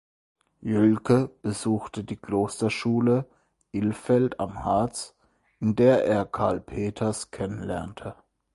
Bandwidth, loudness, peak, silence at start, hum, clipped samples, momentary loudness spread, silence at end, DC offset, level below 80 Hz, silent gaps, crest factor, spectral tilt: 11.5 kHz; -26 LUFS; -8 dBFS; 0.6 s; none; under 0.1%; 14 LU; 0.4 s; under 0.1%; -52 dBFS; none; 18 dB; -6.5 dB/octave